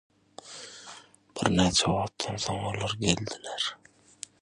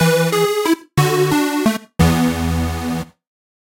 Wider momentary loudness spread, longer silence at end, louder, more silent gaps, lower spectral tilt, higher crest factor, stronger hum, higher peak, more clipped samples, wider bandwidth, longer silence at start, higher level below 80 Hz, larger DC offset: first, 21 LU vs 8 LU; about the same, 0.65 s vs 0.65 s; second, -28 LUFS vs -17 LUFS; neither; second, -4 dB/octave vs -5.5 dB/octave; first, 26 dB vs 18 dB; neither; second, -4 dBFS vs 0 dBFS; neither; second, 11.5 kHz vs 16.5 kHz; first, 0.45 s vs 0 s; second, -50 dBFS vs -36 dBFS; neither